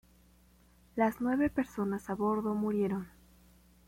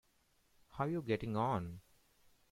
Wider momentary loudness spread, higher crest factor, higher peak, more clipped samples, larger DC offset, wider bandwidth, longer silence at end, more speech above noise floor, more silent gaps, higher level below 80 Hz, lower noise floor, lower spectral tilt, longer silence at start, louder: second, 8 LU vs 18 LU; about the same, 16 dB vs 20 dB; first, -18 dBFS vs -22 dBFS; neither; neither; about the same, 16.5 kHz vs 16 kHz; about the same, 0.8 s vs 0.7 s; second, 31 dB vs 37 dB; neither; about the same, -62 dBFS vs -66 dBFS; second, -63 dBFS vs -74 dBFS; about the same, -8 dB/octave vs -8 dB/octave; first, 0.95 s vs 0.7 s; first, -33 LUFS vs -38 LUFS